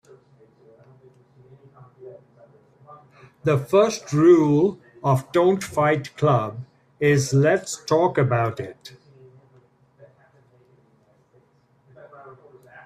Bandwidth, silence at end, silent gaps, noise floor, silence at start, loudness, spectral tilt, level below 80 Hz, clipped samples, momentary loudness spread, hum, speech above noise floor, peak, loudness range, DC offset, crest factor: 14.5 kHz; 0.55 s; none; -60 dBFS; 2 s; -20 LUFS; -6.5 dB/octave; -62 dBFS; under 0.1%; 12 LU; none; 41 dB; -4 dBFS; 8 LU; under 0.1%; 18 dB